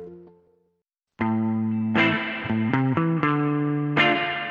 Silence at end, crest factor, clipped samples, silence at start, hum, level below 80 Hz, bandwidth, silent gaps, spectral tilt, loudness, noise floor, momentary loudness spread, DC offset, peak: 0 s; 18 dB; under 0.1%; 0 s; none; -62 dBFS; 7.2 kHz; none; -8 dB/octave; -23 LUFS; -77 dBFS; 6 LU; under 0.1%; -8 dBFS